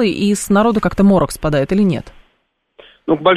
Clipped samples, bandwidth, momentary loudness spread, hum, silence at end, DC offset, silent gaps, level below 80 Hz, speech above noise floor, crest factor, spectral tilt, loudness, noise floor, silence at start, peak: under 0.1%; 13.5 kHz; 7 LU; none; 0 s; under 0.1%; none; -36 dBFS; 51 dB; 14 dB; -6 dB/octave; -15 LUFS; -64 dBFS; 0 s; 0 dBFS